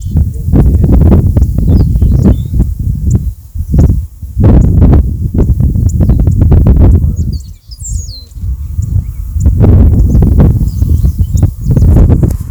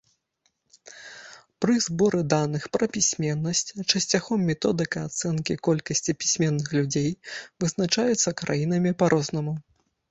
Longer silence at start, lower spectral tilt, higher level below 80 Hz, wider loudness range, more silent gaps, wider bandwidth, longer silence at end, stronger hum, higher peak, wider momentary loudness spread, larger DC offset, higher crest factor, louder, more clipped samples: second, 0 s vs 0.85 s; first, -9 dB/octave vs -4 dB/octave; first, -12 dBFS vs -60 dBFS; about the same, 3 LU vs 2 LU; neither; first, over 20 kHz vs 8.2 kHz; second, 0 s vs 0.5 s; neither; first, 0 dBFS vs -4 dBFS; first, 13 LU vs 9 LU; neither; second, 8 dB vs 20 dB; first, -9 LUFS vs -25 LUFS; first, 4% vs under 0.1%